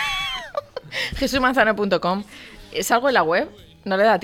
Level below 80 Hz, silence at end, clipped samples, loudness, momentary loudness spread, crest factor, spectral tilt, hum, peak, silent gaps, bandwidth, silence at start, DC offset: -44 dBFS; 0 s; under 0.1%; -21 LUFS; 14 LU; 18 dB; -3.5 dB/octave; none; -4 dBFS; none; 17 kHz; 0 s; under 0.1%